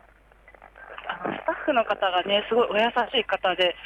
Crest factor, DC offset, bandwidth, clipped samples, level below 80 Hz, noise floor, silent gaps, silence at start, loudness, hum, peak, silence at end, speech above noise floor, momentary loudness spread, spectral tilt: 16 dB; under 0.1%; 9.4 kHz; under 0.1%; -58 dBFS; -54 dBFS; none; 0.6 s; -24 LUFS; none; -10 dBFS; 0 s; 31 dB; 10 LU; -5 dB/octave